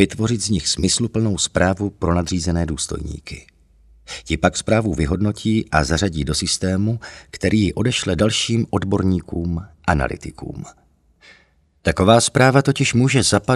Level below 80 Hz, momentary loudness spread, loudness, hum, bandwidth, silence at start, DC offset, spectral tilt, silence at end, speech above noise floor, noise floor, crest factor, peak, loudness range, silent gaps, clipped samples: -36 dBFS; 16 LU; -19 LUFS; none; 12.5 kHz; 0 s; under 0.1%; -4.5 dB/octave; 0 s; 38 dB; -56 dBFS; 20 dB; 0 dBFS; 4 LU; none; under 0.1%